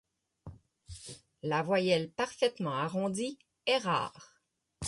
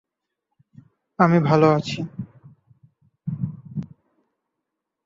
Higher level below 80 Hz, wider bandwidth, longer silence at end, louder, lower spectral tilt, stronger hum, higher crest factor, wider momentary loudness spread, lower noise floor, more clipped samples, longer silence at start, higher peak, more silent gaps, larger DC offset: about the same, -62 dBFS vs -60 dBFS; first, 11.5 kHz vs 7.6 kHz; second, 0 s vs 1.2 s; second, -32 LUFS vs -21 LUFS; second, -4.5 dB/octave vs -7.5 dB/octave; neither; about the same, 18 dB vs 22 dB; second, 20 LU vs 23 LU; second, -61 dBFS vs -82 dBFS; neither; second, 0.45 s vs 1.2 s; second, -16 dBFS vs -4 dBFS; neither; neither